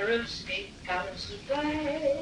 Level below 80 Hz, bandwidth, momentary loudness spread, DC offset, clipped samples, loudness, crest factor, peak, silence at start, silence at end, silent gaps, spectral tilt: -52 dBFS; 11 kHz; 6 LU; under 0.1%; under 0.1%; -32 LUFS; 16 dB; -16 dBFS; 0 s; 0 s; none; -4.5 dB/octave